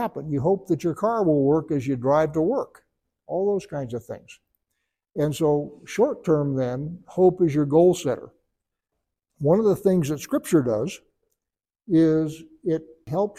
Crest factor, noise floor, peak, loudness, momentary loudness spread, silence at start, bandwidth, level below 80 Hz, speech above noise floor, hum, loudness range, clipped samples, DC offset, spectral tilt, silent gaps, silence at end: 18 dB; -89 dBFS; -6 dBFS; -23 LUFS; 13 LU; 0 s; 15.5 kHz; -58 dBFS; 67 dB; none; 5 LU; under 0.1%; under 0.1%; -7.5 dB/octave; none; 0.05 s